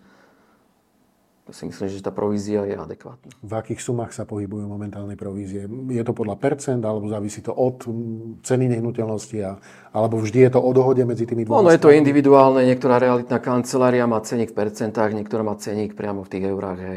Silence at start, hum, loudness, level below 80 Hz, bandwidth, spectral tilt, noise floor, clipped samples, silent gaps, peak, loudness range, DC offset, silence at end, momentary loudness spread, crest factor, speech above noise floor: 1.55 s; none; -20 LUFS; -64 dBFS; 14 kHz; -7 dB/octave; -62 dBFS; under 0.1%; none; 0 dBFS; 13 LU; under 0.1%; 0 s; 17 LU; 20 dB; 42 dB